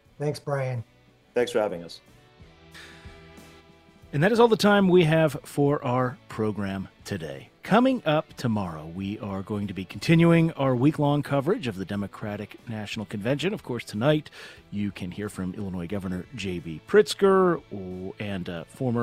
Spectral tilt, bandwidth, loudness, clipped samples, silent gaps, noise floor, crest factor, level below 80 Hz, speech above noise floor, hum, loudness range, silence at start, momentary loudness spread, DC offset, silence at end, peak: -6.5 dB/octave; 15.5 kHz; -25 LUFS; under 0.1%; none; -53 dBFS; 20 dB; -56 dBFS; 28 dB; none; 7 LU; 0.2 s; 17 LU; under 0.1%; 0 s; -6 dBFS